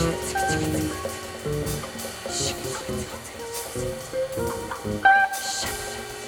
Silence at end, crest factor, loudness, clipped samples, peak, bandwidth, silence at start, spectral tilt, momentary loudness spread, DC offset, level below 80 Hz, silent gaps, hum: 0 s; 22 dB; -26 LUFS; under 0.1%; -6 dBFS; 20 kHz; 0 s; -3.5 dB/octave; 13 LU; under 0.1%; -44 dBFS; none; none